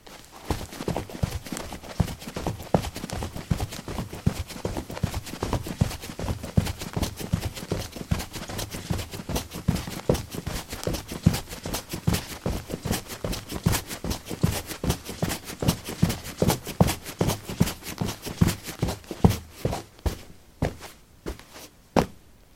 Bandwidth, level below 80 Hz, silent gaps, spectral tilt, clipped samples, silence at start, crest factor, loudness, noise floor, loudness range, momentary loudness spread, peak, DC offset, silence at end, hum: 16.5 kHz; -40 dBFS; none; -5 dB/octave; under 0.1%; 0.05 s; 28 dB; -29 LUFS; -48 dBFS; 4 LU; 8 LU; -2 dBFS; under 0.1%; 0.2 s; none